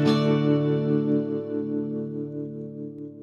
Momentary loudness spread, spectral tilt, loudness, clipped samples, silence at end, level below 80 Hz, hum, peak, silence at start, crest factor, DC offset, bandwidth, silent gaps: 14 LU; -8.5 dB/octave; -26 LUFS; under 0.1%; 0 s; -72 dBFS; none; -8 dBFS; 0 s; 16 dB; under 0.1%; 8.4 kHz; none